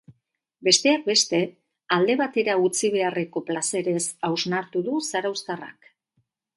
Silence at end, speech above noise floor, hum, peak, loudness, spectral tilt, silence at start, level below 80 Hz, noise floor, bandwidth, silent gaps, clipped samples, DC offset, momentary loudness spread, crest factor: 0.85 s; 49 dB; none; -4 dBFS; -23 LUFS; -3 dB/octave; 0.1 s; -74 dBFS; -72 dBFS; 11.5 kHz; none; under 0.1%; under 0.1%; 10 LU; 22 dB